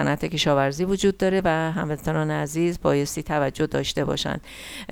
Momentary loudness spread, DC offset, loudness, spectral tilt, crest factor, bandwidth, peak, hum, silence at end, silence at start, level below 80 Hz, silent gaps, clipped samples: 6 LU; under 0.1%; -24 LUFS; -5 dB/octave; 18 dB; 18 kHz; -6 dBFS; none; 0 s; 0 s; -44 dBFS; none; under 0.1%